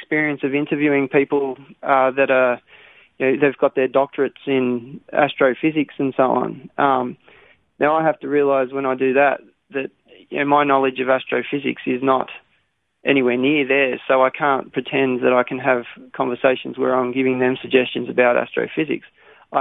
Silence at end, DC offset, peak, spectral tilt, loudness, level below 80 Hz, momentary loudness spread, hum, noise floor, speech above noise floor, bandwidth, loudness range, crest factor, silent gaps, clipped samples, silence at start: 0 s; under 0.1%; -2 dBFS; -9 dB/octave; -19 LUFS; -66 dBFS; 9 LU; none; -67 dBFS; 48 dB; 4 kHz; 2 LU; 18 dB; none; under 0.1%; 0 s